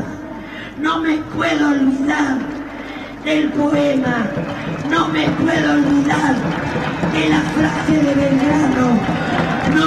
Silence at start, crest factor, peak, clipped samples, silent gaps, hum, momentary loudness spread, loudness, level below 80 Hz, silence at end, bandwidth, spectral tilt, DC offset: 0 s; 14 dB; -4 dBFS; under 0.1%; none; none; 11 LU; -17 LUFS; -42 dBFS; 0 s; 10.5 kHz; -6 dB/octave; under 0.1%